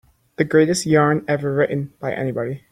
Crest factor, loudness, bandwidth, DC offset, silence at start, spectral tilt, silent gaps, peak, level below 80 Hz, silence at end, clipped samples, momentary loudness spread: 16 dB; -19 LUFS; 15.5 kHz; under 0.1%; 0.4 s; -6 dB/octave; none; -2 dBFS; -58 dBFS; 0.15 s; under 0.1%; 9 LU